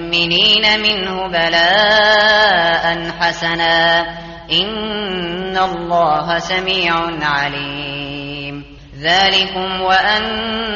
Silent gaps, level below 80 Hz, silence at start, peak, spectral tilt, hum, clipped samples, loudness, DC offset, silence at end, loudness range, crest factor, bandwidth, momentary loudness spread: none; -42 dBFS; 0 s; -2 dBFS; 0 dB/octave; none; under 0.1%; -14 LUFS; under 0.1%; 0 s; 5 LU; 14 dB; 7.4 kHz; 13 LU